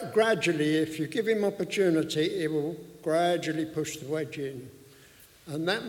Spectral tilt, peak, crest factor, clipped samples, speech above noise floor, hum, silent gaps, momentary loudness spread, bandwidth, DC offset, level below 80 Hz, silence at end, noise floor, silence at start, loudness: -5 dB/octave; -12 dBFS; 16 dB; under 0.1%; 27 dB; none; none; 11 LU; 17 kHz; under 0.1%; -68 dBFS; 0 s; -55 dBFS; 0 s; -28 LUFS